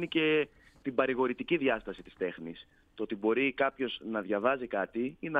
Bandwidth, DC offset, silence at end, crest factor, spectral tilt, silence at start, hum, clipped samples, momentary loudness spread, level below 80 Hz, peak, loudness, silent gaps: 4.9 kHz; under 0.1%; 0 s; 20 dB; -7.5 dB/octave; 0 s; none; under 0.1%; 13 LU; -64 dBFS; -12 dBFS; -32 LUFS; none